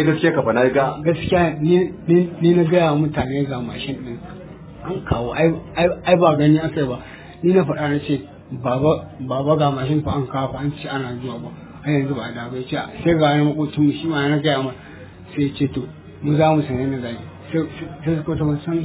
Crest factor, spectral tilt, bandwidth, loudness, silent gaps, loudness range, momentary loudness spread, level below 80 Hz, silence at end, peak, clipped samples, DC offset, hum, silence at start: 18 dB; -11.5 dB/octave; 4 kHz; -20 LUFS; none; 4 LU; 14 LU; -42 dBFS; 0 s; -2 dBFS; under 0.1%; under 0.1%; none; 0 s